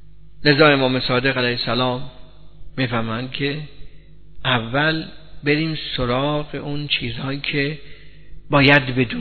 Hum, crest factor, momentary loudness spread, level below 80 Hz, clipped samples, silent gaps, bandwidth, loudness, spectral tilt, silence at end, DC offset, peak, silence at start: 50 Hz at -45 dBFS; 20 dB; 14 LU; -42 dBFS; under 0.1%; none; 6 kHz; -19 LUFS; -8 dB/octave; 0 s; 1%; 0 dBFS; 0.4 s